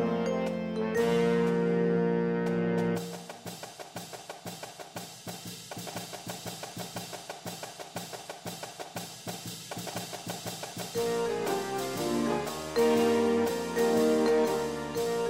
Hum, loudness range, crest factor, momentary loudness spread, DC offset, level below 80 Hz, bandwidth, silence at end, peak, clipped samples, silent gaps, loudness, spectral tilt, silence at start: none; 12 LU; 16 dB; 16 LU; under 0.1%; -62 dBFS; 16 kHz; 0 s; -14 dBFS; under 0.1%; none; -31 LUFS; -5 dB/octave; 0 s